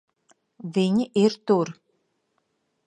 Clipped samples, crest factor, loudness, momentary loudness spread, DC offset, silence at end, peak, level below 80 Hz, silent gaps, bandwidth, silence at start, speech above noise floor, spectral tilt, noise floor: under 0.1%; 20 dB; -23 LUFS; 10 LU; under 0.1%; 1.15 s; -6 dBFS; -72 dBFS; none; 10 kHz; 0.65 s; 51 dB; -7 dB/octave; -73 dBFS